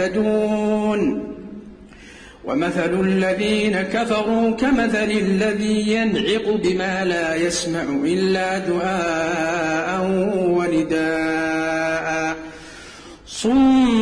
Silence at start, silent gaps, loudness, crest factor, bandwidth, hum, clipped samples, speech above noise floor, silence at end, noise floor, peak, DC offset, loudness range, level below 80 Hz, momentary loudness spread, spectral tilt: 0 s; none; -20 LUFS; 12 dB; 10.5 kHz; none; under 0.1%; 23 dB; 0 s; -42 dBFS; -8 dBFS; under 0.1%; 3 LU; -46 dBFS; 10 LU; -5 dB/octave